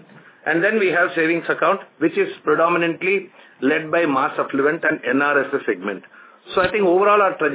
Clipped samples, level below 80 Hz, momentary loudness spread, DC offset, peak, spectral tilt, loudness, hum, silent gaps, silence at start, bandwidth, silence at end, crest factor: under 0.1%; -60 dBFS; 7 LU; under 0.1%; -4 dBFS; -9 dB/octave; -19 LUFS; none; none; 0.45 s; 4 kHz; 0 s; 16 dB